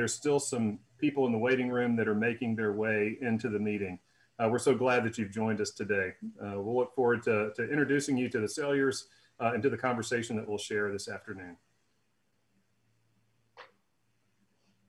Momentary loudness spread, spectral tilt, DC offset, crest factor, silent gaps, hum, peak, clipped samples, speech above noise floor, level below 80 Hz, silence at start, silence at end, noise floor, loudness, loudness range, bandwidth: 9 LU; -5 dB/octave; under 0.1%; 18 dB; none; none; -14 dBFS; under 0.1%; 46 dB; -74 dBFS; 0 s; 1.25 s; -77 dBFS; -31 LUFS; 7 LU; 12.5 kHz